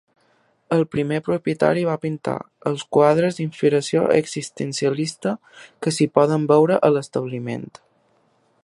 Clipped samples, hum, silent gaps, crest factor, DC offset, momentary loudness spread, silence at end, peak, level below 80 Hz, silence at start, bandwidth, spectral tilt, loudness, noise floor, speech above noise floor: under 0.1%; none; none; 20 dB; under 0.1%; 11 LU; 1 s; 0 dBFS; -62 dBFS; 0.7 s; 11.5 kHz; -6 dB/octave; -21 LUFS; -62 dBFS; 42 dB